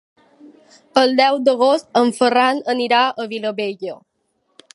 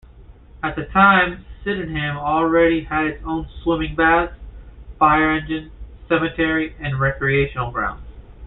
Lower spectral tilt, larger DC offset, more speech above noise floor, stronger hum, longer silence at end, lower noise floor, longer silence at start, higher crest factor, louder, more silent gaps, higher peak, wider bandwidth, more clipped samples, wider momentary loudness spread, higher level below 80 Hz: second, -3.5 dB/octave vs -11 dB/octave; neither; first, 51 dB vs 25 dB; neither; first, 0.8 s vs 0 s; first, -68 dBFS vs -43 dBFS; first, 0.45 s vs 0.15 s; about the same, 18 dB vs 18 dB; about the same, -17 LUFS vs -19 LUFS; neither; about the same, 0 dBFS vs -2 dBFS; first, 11.5 kHz vs 4.1 kHz; neither; about the same, 10 LU vs 12 LU; second, -74 dBFS vs -38 dBFS